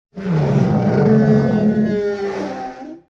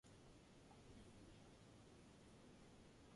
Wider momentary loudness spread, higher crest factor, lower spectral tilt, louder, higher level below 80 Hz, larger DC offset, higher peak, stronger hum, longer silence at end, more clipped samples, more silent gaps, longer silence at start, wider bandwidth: first, 14 LU vs 2 LU; about the same, 12 dB vs 14 dB; first, -9 dB/octave vs -5 dB/octave; first, -17 LUFS vs -66 LUFS; first, -44 dBFS vs -74 dBFS; neither; first, -4 dBFS vs -52 dBFS; neither; first, 0.15 s vs 0 s; neither; neither; about the same, 0.15 s vs 0.05 s; second, 7.2 kHz vs 11.5 kHz